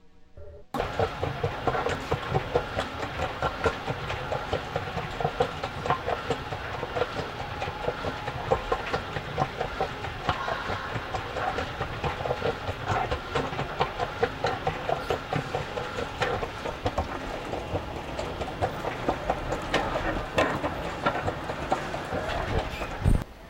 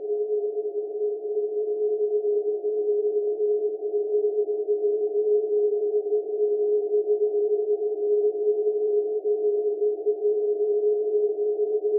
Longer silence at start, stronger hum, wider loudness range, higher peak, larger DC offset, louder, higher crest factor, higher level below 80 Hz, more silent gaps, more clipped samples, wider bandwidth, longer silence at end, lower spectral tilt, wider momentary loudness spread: about the same, 0 s vs 0 s; neither; about the same, 2 LU vs 2 LU; first, -10 dBFS vs -14 dBFS; neither; second, -30 LUFS vs -25 LUFS; first, 20 dB vs 10 dB; first, -40 dBFS vs under -90 dBFS; neither; neither; first, 16 kHz vs 0.9 kHz; about the same, 0 s vs 0 s; second, -5.5 dB/octave vs -11.5 dB/octave; about the same, 5 LU vs 4 LU